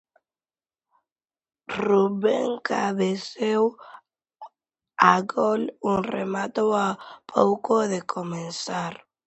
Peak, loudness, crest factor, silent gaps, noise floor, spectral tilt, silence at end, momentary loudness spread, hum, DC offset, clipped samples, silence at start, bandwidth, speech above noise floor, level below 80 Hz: 0 dBFS; -24 LUFS; 24 dB; none; under -90 dBFS; -5.5 dB/octave; 0.3 s; 11 LU; none; under 0.1%; under 0.1%; 1.7 s; 8.4 kHz; over 66 dB; -66 dBFS